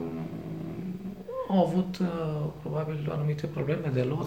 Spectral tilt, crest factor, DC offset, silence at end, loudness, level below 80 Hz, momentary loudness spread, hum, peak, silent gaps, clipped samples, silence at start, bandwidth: -8.5 dB/octave; 18 dB; 0.1%; 0 s; -31 LUFS; -58 dBFS; 11 LU; none; -12 dBFS; none; under 0.1%; 0 s; 15.5 kHz